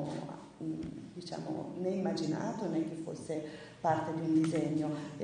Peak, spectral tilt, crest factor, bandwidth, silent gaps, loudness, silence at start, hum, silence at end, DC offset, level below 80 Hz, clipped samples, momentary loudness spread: -18 dBFS; -7 dB/octave; 18 dB; 10 kHz; none; -36 LUFS; 0 s; none; 0 s; under 0.1%; -68 dBFS; under 0.1%; 12 LU